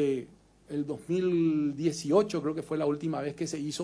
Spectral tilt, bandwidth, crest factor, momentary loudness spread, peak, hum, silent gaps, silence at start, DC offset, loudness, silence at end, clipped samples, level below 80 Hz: -6 dB/octave; 11 kHz; 16 dB; 9 LU; -14 dBFS; none; none; 0 s; under 0.1%; -30 LUFS; 0 s; under 0.1%; -66 dBFS